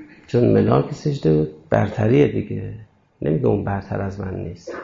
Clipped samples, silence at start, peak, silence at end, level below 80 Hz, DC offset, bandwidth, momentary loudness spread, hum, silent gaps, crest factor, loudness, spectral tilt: under 0.1%; 0 s; -4 dBFS; 0 s; -46 dBFS; under 0.1%; 7.6 kHz; 13 LU; none; none; 16 dB; -20 LUFS; -9 dB/octave